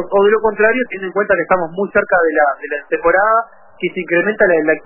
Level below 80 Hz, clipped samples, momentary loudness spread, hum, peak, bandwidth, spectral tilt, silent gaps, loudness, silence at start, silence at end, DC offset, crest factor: -46 dBFS; under 0.1%; 9 LU; none; 0 dBFS; 3.1 kHz; -9.5 dB/octave; none; -15 LUFS; 0 s; 0.05 s; under 0.1%; 14 dB